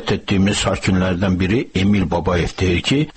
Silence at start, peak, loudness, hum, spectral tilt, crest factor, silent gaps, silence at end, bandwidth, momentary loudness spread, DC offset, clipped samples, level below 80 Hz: 0 s; -6 dBFS; -18 LUFS; none; -5.5 dB/octave; 12 dB; none; 0.05 s; 8.8 kHz; 2 LU; 0.3%; under 0.1%; -34 dBFS